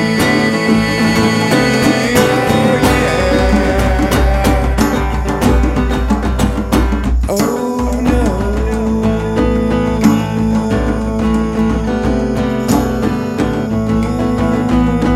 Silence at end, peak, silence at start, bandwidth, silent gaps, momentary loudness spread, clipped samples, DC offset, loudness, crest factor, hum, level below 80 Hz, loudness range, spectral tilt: 0 s; 0 dBFS; 0 s; 16 kHz; none; 5 LU; under 0.1%; under 0.1%; -14 LUFS; 12 dB; none; -20 dBFS; 3 LU; -6 dB/octave